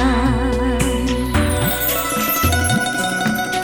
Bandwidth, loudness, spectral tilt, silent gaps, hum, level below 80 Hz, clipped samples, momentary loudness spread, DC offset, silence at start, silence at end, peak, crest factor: 18 kHz; -18 LUFS; -4.5 dB/octave; none; none; -26 dBFS; under 0.1%; 3 LU; under 0.1%; 0 s; 0 s; -2 dBFS; 16 dB